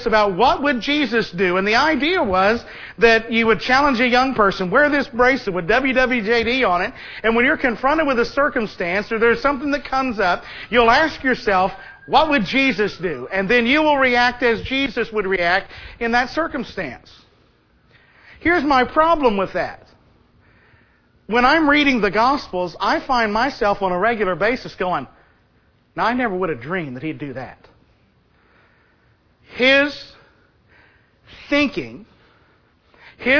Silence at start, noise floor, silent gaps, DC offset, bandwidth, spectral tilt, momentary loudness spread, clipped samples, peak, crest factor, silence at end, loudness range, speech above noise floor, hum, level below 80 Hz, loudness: 0 s; -58 dBFS; none; under 0.1%; 5.4 kHz; -5 dB/octave; 11 LU; under 0.1%; 0 dBFS; 20 dB; 0 s; 7 LU; 40 dB; none; -42 dBFS; -18 LUFS